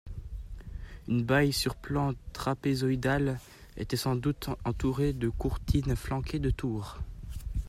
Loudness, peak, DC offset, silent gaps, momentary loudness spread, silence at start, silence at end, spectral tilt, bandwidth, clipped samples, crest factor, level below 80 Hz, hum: -31 LUFS; -12 dBFS; under 0.1%; none; 16 LU; 0.05 s; 0 s; -6 dB/octave; 15.5 kHz; under 0.1%; 18 dB; -40 dBFS; none